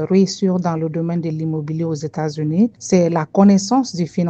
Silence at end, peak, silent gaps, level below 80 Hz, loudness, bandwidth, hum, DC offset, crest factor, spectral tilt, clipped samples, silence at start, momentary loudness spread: 0 s; 0 dBFS; none; -58 dBFS; -18 LUFS; 8.4 kHz; none; under 0.1%; 16 dB; -6.5 dB/octave; under 0.1%; 0 s; 10 LU